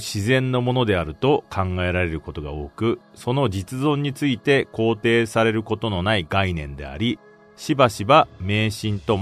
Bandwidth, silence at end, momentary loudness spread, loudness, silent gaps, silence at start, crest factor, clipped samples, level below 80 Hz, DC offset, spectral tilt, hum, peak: 13.5 kHz; 0 s; 8 LU; -21 LUFS; none; 0 s; 18 dB; under 0.1%; -44 dBFS; under 0.1%; -6 dB/octave; none; -2 dBFS